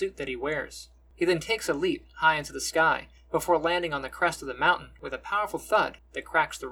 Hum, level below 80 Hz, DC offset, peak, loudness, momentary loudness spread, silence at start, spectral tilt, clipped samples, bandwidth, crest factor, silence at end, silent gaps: none; -54 dBFS; under 0.1%; -8 dBFS; -27 LUFS; 8 LU; 0 s; -3.5 dB/octave; under 0.1%; 19 kHz; 20 dB; 0 s; none